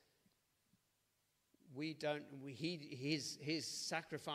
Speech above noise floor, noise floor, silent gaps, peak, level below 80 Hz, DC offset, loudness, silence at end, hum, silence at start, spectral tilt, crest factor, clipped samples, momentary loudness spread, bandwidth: 38 dB; -83 dBFS; none; -26 dBFS; -88 dBFS; under 0.1%; -44 LUFS; 0 s; none; 1.65 s; -4 dB/octave; 20 dB; under 0.1%; 6 LU; 15.5 kHz